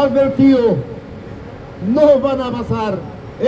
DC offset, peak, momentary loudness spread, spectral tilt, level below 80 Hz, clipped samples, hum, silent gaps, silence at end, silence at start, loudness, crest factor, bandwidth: under 0.1%; 0 dBFS; 21 LU; -8.5 dB/octave; -40 dBFS; under 0.1%; none; none; 0 s; 0 s; -15 LUFS; 16 dB; 8 kHz